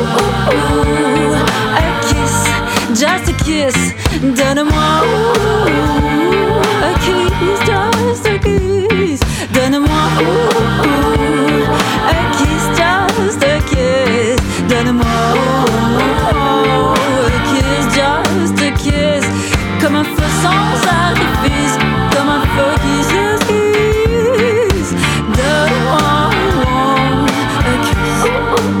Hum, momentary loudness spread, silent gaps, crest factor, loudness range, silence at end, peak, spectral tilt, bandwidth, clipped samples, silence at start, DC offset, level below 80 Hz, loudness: none; 2 LU; none; 12 dB; 1 LU; 0 s; 0 dBFS; -5 dB/octave; 19.5 kHz; under 0.1%; 0 s; under 0.1%; -24 dBFS; -12 LUFS